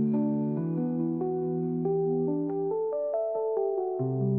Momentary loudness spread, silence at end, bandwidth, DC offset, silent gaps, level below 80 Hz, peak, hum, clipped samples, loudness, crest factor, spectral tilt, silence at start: 3 LU; 0 s; 2.6 kHz; under 0.1%; none; -72 dBFS; -18 dBFS; none; under 0.1%; -29 LUFS; 10 dB; -14.5 dB/octave; 0 s